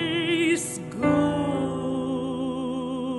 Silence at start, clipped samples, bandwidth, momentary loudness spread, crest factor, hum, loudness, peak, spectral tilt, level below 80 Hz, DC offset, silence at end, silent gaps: 0 s; under 0.1%; 11.5 kHz; 7 LU; 16 dB; none; -26 LUFS; -10 dBFS; -5 dB/octave; -54 dBFS; under 0.1%; 0 s; none